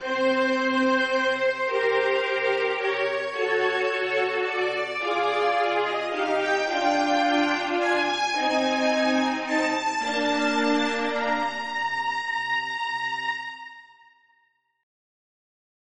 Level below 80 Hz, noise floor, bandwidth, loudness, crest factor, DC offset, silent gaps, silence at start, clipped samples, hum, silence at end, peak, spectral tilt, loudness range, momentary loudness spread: -70 dBFS; -68 dBFS; 10.5 kHz; -24 LUFS; 14 dB; under 0.1%; none; 0 s; under 0.1%; none; 2 s; -10 dBFS; -2.5 dB/octave; 6 LU; 5 LU